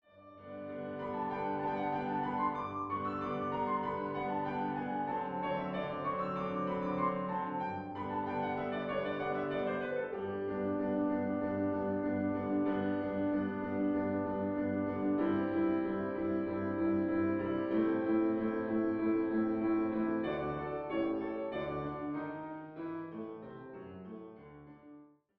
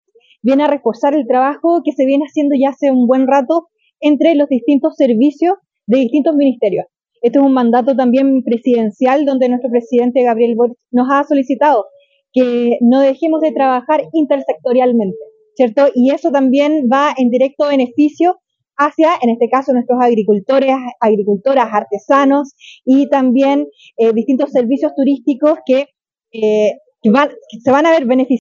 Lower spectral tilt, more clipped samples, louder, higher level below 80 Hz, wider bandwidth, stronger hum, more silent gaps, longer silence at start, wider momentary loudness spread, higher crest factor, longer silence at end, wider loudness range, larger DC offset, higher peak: about the same, -6.5 dB/octave vs -6.5 dB/octave; neither; second, -35 LUFS vs -13 LUFS; first, -66 dBFS vs -72 dBFS; second, 5.2 kHz vs 7.2 kHz; neither; neither; second, 0.15 s vs 0.45 s; first, 11 LU vs 6 LU; about the same, 14 dB vs 12 dB; first, 0.3 s vs 0 s; first, 5 LU vs 1 LU; neither; second, -20 dBFS vs 0 dBFS